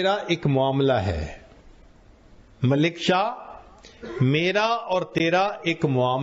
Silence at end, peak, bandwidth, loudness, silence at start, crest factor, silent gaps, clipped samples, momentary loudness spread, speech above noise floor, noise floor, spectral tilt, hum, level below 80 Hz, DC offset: 0 s; -8 dBFS; 8 kHz; -23 LUFS; 0 s; 16 dB; none; under 0.1%; 13 LU; 29 dB; -51 dBFS; -4.5 dB/octave; none; -46 dBFS; under 0.1%